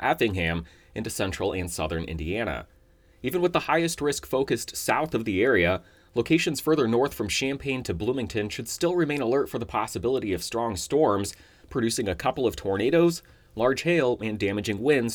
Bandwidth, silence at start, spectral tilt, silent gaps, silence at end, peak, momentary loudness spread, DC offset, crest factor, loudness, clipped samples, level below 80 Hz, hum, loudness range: over 20 kHz; 0 s; -4.5 dB/octave; none; 0 s; -8 dBFS; 8 LU; under 0.1%; 18 dB; -26 LUFS; under 0.1%; -50 dBFS; none; 3 LU